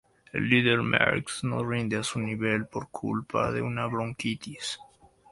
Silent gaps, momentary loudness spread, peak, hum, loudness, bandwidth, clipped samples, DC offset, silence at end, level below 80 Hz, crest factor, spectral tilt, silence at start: none; 12 LU; -4 dBFS; none; -28 LUFS; 11.5 kHz; under 0.1%; under 0.1%; 0.5 s; -58 dBFS; 24 dB; -5 dB/octave; 0.35 s